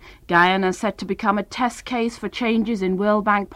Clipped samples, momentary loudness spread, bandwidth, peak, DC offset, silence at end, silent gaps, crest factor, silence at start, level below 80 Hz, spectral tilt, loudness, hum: under 0.1%; 8 LU; 13 kHz; -4 dBFS; under 0.1%; 0 s; none; 16 dB; 0 s; -50 dBFS; -5.5 dB/octave; -21 LUFS; none